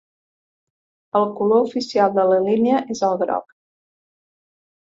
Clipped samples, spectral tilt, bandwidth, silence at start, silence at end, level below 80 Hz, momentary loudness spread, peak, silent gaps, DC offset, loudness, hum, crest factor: under 0.1%; -6 dB/octave; 7.8 kHz; 1.15 s; 1.45 s; -68 dBFS; 6 LU; -2 dBFS; none; under 0.1%; -19 LUFS; none; 18 dB